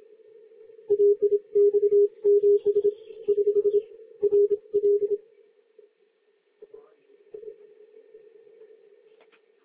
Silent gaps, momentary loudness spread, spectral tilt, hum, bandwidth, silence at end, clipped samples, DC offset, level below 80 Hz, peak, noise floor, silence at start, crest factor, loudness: none; 15 LU; -10.5 dB/octave; none; 1.3 kHz; 2.1 s; under 0.1%; under 0.1%; -78 dBFS; -14 dBFS; -67 dBFS; 0.9 s; 12 dB; -23 LUFS